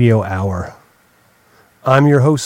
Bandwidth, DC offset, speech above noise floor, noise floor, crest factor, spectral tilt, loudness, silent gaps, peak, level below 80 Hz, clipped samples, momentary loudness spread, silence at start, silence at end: 11.5 kHz; under 0.1%; 40 dB; -53 dBFS; 16 dB; -7 dB/octave; -15 LUFS; none; 0 dBFS; -46 dBFS; under 0.1%; 14 LU; 0 s; 0 s